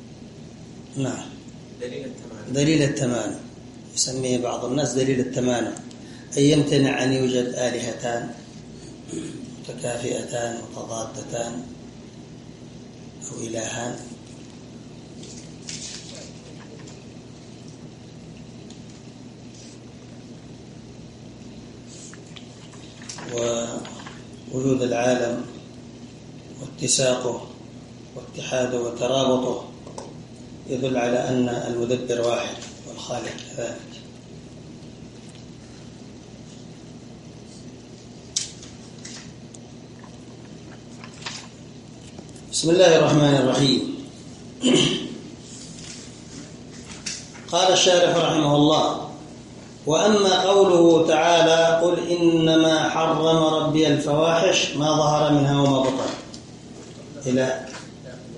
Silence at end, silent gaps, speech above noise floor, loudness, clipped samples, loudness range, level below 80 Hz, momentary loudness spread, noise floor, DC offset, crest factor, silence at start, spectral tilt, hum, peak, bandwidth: 0 s; none; 21 dB; -21 LUFS; under 0.1%; 22 LU; -56 dBFS; 24 LU; -42 dBFS; under 0.1%; 20 dB; 0 s; -4.5 dB/octave; none; -4 dBFS; 11.5 kHz